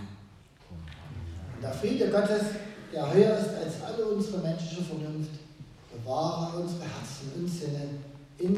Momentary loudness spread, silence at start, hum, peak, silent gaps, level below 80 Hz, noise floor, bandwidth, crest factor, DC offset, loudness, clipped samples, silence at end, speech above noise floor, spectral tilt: 20 LU; 0 s; none; -8 dBFS; none; -56 dBFS; -54 dBFS; 14 kHz; 22 dB; under 0.1%; -31 LUFS; under 0.1%; 0 s; 24 dB; -6.5 dB/octave